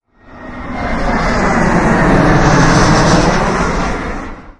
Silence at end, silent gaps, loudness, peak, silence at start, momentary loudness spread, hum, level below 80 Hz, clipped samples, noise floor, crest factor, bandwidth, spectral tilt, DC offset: 0.1 s; none; -12 LUFS; 0 dBFS; 0.3 s; 14 LU; none; -20 dBFS; under 0.1%; -33 dBFS; 12 dB; 11 kHz; -5.5 dB/octave; under 0.1%